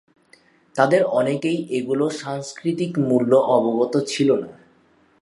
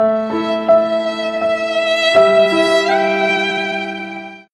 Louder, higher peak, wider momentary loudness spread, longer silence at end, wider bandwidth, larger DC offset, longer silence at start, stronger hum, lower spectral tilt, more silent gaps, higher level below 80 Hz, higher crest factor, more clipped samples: second, -20 LUFS vs -15 LUFS; about the same, -2 dBFS vs 0 dBFS; about the same, 10 LU vs 10 LU; first, 0.7 s vs 0.1 s; about the same, 11.5 kHz vs 11 kHz; neither; first, 0.75 s vs 0 s; neither; first, -6 dB/octave vs -4 dB/octave; neither; second, -68 dBFS vs -56 dBFS; first, 20 dB vs 14 dB; neither